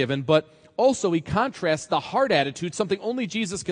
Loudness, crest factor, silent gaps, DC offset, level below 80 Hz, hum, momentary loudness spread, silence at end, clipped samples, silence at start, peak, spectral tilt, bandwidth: -24 LUFS; 18 dB; none; under 0.1%; -56 dBFS; none; 6 LU; 0 s; under 0.1%; 0 s; -6 dBFS; -5 dB/octave; 10.5 kHz